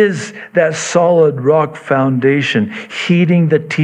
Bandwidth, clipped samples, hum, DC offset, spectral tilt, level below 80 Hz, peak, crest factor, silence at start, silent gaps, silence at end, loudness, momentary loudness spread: 9.8 kHz; under 0.1%; none; under 0.1%; -6 dB/octave; -64 dBFS; 0 dBFS; 12 dB; 0 s; none; 0 s; -13 LUFS; 7 LU